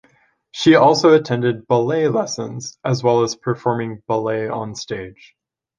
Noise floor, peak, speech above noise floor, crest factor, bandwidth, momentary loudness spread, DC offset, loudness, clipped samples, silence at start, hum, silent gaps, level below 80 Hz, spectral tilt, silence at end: -58 dBFS; -2 dBFS; 40 dB; 16 dB; 9.4 kHz; 16 LU; under 0.1%; -18 LUFS; under 0.1%; 0.55 s; none; none; -58 dBFS; -5.5 dB/octave; 0.65 s